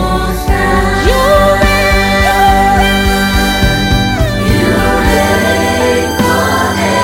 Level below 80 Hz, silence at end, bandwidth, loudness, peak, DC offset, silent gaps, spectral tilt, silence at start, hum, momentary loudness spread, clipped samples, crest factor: -18 dBFS; 0 s; 17 kHz; -10 LUFS; 0 dBFS; under 0.1%; none; -4.5 dB/octave; 0 s; none; 3 LU; 0.3%; 10 dB